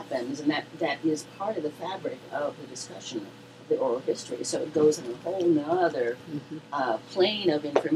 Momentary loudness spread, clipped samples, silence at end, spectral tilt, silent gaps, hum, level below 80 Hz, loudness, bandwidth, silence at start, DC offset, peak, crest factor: 13 LU; under 0.1%; 0 s; -4.5 dB/octave; none; none; -74 dBFS; -29 LUFS; 13.5 kHz; 0 s; under 0.1%; -4 dBFS; 24 dB